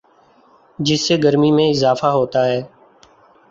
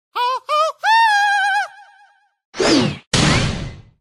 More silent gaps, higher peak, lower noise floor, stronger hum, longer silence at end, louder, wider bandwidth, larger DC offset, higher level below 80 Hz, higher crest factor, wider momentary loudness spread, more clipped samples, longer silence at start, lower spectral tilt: second, none vs 2.45-2.53 s, 3.07-3.11 s; about the same, -2 dBFS vs -2 dBFS; about the same, -52 dBFS vs -53 dBFS; neither; first, 0.85 s vs 0.2 s; about the same, -16 LUFS vs -16 LUFS; second, 7.8 kHz vs 16 kHz; neither; second, -56 dBFS vs -38 dBFS; about the same, 16 dB vs 16 dB; second, 6 LU vs 15 LU; neither; first, 0.8 s vs 0.15 s; first, -5.5 dB/octave vs -4 dB/octave